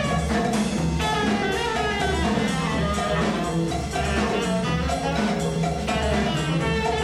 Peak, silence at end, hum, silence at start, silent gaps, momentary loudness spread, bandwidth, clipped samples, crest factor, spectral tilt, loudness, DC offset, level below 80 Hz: -10 dBFS; 0 s; none; 0 s; none; 2 LU; 13.5 kHz; under 0.1%; 14 dB; -5 dB/octave; -23 LUFS; under 0.1%; -34 dBFS